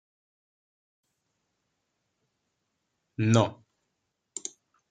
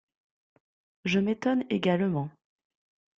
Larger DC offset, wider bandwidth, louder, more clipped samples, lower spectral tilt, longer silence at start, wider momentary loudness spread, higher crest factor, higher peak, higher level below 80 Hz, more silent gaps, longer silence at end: neither; first, 9.4 kHz vs 7.4 kHz; about the same, -28 LUFS vs -28 LUFS; neither; second, -5.5 dB/octave vs -7 dB/octave; first, 3.2 s vs 1.05 s; first, 18 LU vs 9 LU; first, 28 dB vs 18 dB; first, -6 dBFS vs -12 dBFS; about the same, -72 dBFS vs -68 dBFS; neither; second, 0.4 s vs 0.9 s